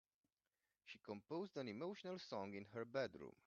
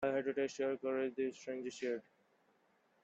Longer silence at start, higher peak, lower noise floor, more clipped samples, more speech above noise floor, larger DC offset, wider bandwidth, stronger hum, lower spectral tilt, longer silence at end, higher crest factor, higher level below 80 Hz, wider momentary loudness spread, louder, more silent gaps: first, 0.85 s vs 0 s; second, -30 dBFS vs -24 dBFS; first, under -90 dBFS vs -75 dBFS; neither; first, over 40 dB vs 35 dB; neither; second, 7.2 kHz vs 8.2 kHz; neither; about the same, -4.5 dB/octave vs -4.5 dB/octave; second, 0.15 s vs 1.05 s; about the same, 20 dB vs 16 dB; second, -88 dBFS vs -82 dBFS; first, 10 LU vs 7 LU; second, -50 LUFS vs -40 LUFS; neither